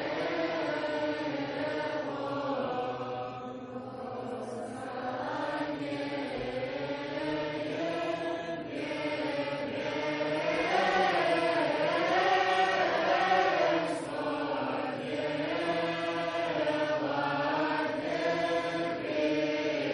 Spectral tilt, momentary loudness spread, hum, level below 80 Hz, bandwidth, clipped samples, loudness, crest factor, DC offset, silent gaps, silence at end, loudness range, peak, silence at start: -5 dB/octave; 10 LU; none; -66 dBFS; 10.5 kHz; under 0.1%; -31 LUFS; 18 dB; under 0.1%; none; 0 s; 9 LU; -14 dBFS; 0 s